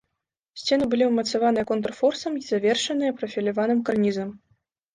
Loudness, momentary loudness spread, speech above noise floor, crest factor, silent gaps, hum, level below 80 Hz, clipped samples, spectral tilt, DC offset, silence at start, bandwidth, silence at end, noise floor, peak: -24 LUFS; 8 LU; 59 dB; 16 dB; none; none; -62 dBFS; under 0.1%; -4.5 dB/octave; under 0.1%; 0.55 s; 10 kHz; 0.55 s; -82 dBFS; -10 dBFS